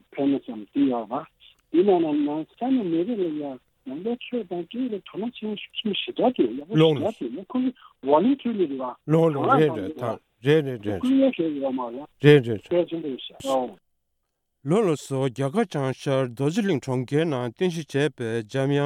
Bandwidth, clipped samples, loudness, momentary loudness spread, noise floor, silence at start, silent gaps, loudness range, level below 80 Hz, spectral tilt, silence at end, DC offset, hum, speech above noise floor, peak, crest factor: 13.5 kHz; under 0.1%; -24 LUFS; 12 LU; -76 dBFS; 0.15 s; none; 5 LU; -68 dBFS; -7 dB/octave; 0 s; under 0.1%; none; 53 dB; -2 dBFS; 22 dB